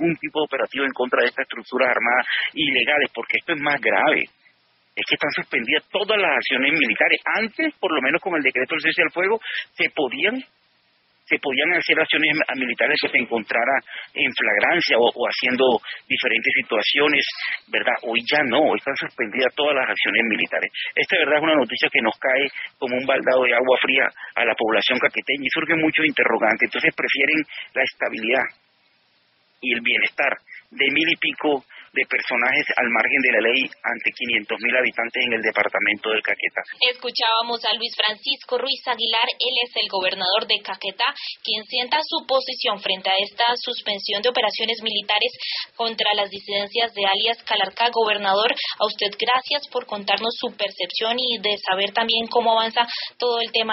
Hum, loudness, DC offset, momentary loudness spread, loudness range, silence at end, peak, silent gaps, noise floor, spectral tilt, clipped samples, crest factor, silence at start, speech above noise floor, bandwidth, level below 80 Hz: none; -20 LUFS; under 0.1%; 7 LU; 3 LU; 0 s; 0 dBFS; none; -63 dBFS; 0.5 dB/octave; under 0.1%; 22 dB; 0 s; 41 dB; 6 kHz; -70 dBFS